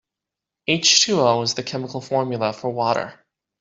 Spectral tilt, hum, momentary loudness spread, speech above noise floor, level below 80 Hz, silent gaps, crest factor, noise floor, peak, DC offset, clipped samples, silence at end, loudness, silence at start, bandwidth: -2.5 dB/octave; none; 14 LU; 65 dB; -64 dBFS; none; 20 dB; -86 dBFS; -2 dBFS; under 0.1%; under 0.1%; 0.5 s; -19 LUFS; 0.7 s; 8 kHz